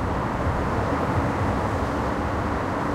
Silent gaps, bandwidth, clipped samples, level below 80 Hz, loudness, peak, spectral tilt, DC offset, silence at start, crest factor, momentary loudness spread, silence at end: none; 15 kHz; under 0.1%; -34 dBFS; -25 LUFS; -12 dBFS; -7 dB/octave; under 0.1%; 0 s; 12 dB; 2 LU; 0 s